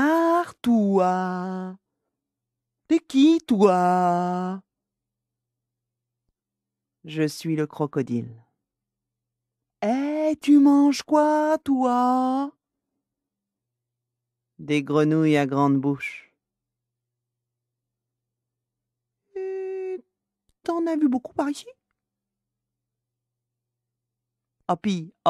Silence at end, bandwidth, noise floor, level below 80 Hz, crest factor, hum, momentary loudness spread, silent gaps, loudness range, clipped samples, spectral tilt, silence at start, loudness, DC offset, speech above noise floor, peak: 0 s; 13 kHz; -87 dBFS; -72 dBFS; 20 dB; none; 16 LU; none; 14 LU; under 0.1%; -6.5 dB/octave; 0 s; -22 LUFS; under 0.1%; 65 dB; -4 dBFS